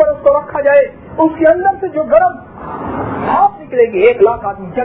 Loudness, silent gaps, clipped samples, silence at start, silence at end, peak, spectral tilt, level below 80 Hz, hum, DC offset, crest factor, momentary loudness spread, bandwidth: -13 LUFS; none; under 0.1%; 0 s; 0 s; 0 dBFS; -10.5 dB/octave; -42 dBFS; none; 0.2%; 12 dB; 11 LU; 4 kHz